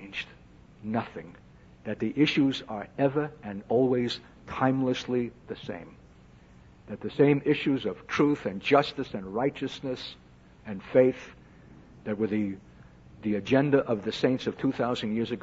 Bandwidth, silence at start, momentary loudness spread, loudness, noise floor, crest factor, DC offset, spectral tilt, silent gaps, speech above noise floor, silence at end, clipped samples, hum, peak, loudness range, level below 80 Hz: 7.8 kHz; 0 s; 17 LU; -28 LUFS; -54 dBFS; 22 dB; under 0.1%; -7 dB/octave; none; 26 dB; 0 s; under 0.1%; none; -8 dBFS; 4 LU; -60 dBFS